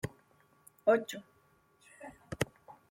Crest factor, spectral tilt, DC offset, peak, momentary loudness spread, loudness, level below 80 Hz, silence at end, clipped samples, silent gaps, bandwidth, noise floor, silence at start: 22 dB; -5 dB/octave; under 0.1%; -14 dBFS; 22 LU; -34 LUFS; -64 dBFS; 0.2 s; under 0.1%; none; 16.5 kHz; -69 dBFS; 0.05 s